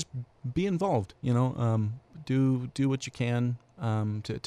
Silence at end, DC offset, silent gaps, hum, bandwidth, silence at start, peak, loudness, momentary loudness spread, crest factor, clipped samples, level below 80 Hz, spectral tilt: 0.05 s; under 0.1%; none; none; 10 kHz; 0 s; -14 dBFS; -30 LUFS; 8 LU; 16 dB; under 0.1%; -58 dBFS; -7.5 dB/octave